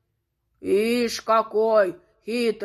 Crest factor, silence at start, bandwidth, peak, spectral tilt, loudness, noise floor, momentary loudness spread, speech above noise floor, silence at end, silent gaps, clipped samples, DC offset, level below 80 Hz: 16 dB; 0.65 s; 14 kHz; -6 dBFS; -4 dB/octave; -22 LUFS; -75 dBFS; 11 LU; 54 dB; 0 s; none; under 0.1%; under 0.1%; -64 dBFS